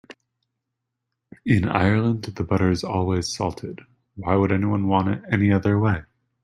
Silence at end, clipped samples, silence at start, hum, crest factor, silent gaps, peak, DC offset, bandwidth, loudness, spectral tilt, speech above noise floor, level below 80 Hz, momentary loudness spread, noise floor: 0.4 s; under 0.1%; 1.45 s; none; 20 dB; none; -2 dBFS; under 0.1%; 11.5 kHz; -22 LUFS; -7 dB/octave; 60 dB; -50 dBFS; 11 LU; -81 dBFS